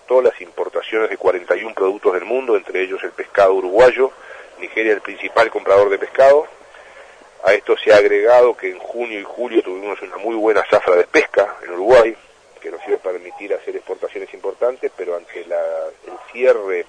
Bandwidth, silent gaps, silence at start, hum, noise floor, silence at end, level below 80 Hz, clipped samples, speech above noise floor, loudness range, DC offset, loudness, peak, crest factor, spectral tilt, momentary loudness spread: 9.8 kHz; none; 0.1 s; none; -42 dBFS; 0.05 s; -54 dBFS; under 0.1%; 26 dB; 9 LU; under 0.1%; -17 LUFS; -2 dBFS; 16 dB; -4 dB/octave; 15 LU